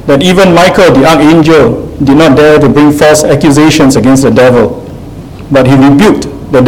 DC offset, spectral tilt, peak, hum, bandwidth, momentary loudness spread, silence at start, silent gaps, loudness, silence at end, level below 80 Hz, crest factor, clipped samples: 1%; -5.5 dB/octave; 0 dBFS; none; 16.5 kHz; 9 LU; 0 s; none; -4 LUFS; 0 s; -28 dBFS; 4 dB; 7%